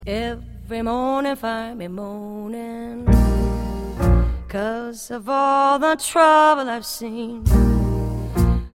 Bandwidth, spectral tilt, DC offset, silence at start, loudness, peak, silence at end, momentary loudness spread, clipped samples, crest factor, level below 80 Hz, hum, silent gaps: 16.5 kHz; -6 dB/octave; under 0.1%; 0 s; -20 LUFS; -2 dBFS; 0.05 s; 15 LU; under 0.1%; 18 dB; -24 dBFS; none; none